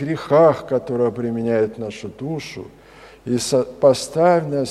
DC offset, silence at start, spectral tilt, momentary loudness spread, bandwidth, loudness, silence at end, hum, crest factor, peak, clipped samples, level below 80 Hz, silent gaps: under 0.1%; 0 s; -5.5 dB/octave; 16 LU; 13.5 kHz; -19 LUFS; 0 s; none; 18 dB; -2 dBFS; under 0.1%; -54 dBFS; none